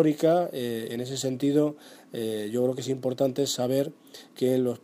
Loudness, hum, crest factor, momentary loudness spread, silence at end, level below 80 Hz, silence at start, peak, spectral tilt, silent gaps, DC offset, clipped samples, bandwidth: -27 LUFS; none; 18 dB; 10 LU; 0.05 s; -74 dBFS; 0 s; -8 dBFS; -5.5 dB/octave; none; under 0.1%; under 0.1%; 15.5 kHz